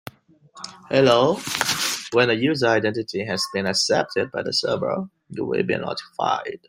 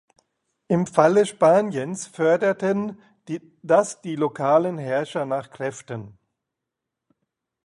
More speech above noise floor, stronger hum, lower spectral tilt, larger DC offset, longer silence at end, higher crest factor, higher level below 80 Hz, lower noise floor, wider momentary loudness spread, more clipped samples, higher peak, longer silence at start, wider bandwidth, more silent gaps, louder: second, 29 dB vs 62 dB; neither; second, -3.5 dB/octave vs -6 dB/octave; neither; second, 0.1 s vs 1.55 s; about the same, 20 dB vs 22 dB; about the same, -62 dBFS vs -66 dBFS; second, -51 dBFS vs -84 dBFS; second, 11 LU vs 16 LU; neither; about the same, -2 dBFS vs -2 dBFS; second, 0.55 s vs 0.7 s; first, 16 kHz vs 11.5 kHz; neither; about the same, -22 LUFS vs -22 LUFS